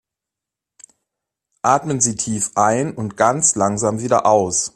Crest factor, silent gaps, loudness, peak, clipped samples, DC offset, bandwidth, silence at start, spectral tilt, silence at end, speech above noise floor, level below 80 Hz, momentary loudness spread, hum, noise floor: 18 dB; none; -17 LUFS; 0 dBFS; under 0.1%; under 0.1%; 14.5 kHz; 1.65 s; -4 dB/octave; 0.1 s; 68 dB; -56 dBFS; 6 LU; none; -85 dBFS